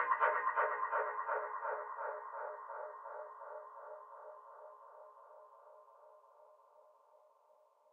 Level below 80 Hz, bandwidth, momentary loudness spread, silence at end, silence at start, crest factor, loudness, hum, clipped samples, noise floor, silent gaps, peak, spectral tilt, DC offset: under -90 dBFS; 3.8 kHz; 25 LU; 1.15 s; 0 s; 24 dB; -40 LUFS; none; under 0.1%; -70 dBFS; none; -18 dBFS; 1.5 dB/octave; under 0.1%